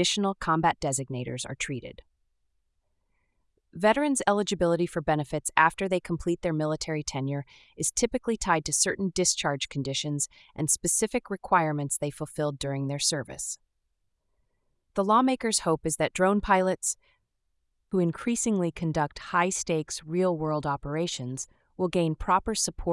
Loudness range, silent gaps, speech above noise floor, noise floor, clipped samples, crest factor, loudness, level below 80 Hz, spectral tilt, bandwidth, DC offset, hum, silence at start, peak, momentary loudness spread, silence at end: 4 LU; none; 49 dB; -77 dBFS; under 0.1%; 22 dB; -27 LUFS; -52 dBFS; -4 dB/octave; 12 kHz; under 0.1%; none; 0 s; -6 dBFS; 10 LU; 0 s